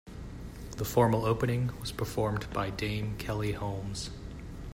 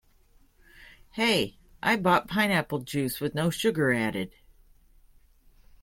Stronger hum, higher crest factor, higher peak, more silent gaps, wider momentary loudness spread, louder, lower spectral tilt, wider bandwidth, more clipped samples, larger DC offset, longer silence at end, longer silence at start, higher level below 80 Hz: neither; about the same, 22 dB vs 22 dB; about the same, -10 dBFS vs -8 dBFS; neither; first, 17 LU vs 10 LU; second, -32 LUFS vs -26 LUFS; about the same, -6 dB/octave vs -5 dB/octave; about the same, 16 kHz vs 16.5 kHz; neither; neither; second, 0 s vs 1.55 s; second, 0.05 s vs 0.8 s; first, -46 dBFS vs -58 dBFS